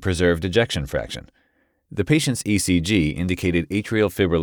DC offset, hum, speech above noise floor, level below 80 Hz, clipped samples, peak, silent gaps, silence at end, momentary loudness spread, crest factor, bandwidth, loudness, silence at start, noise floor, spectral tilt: under 0.1%; none; 45 dB; -40 dBFS; under 0.1%; -4 dBFS; none; 0 s; 9 LU; 16 dB; over 20 kHz; -21 LUFS; 0 s; -66 dBFS; -5 dB/octave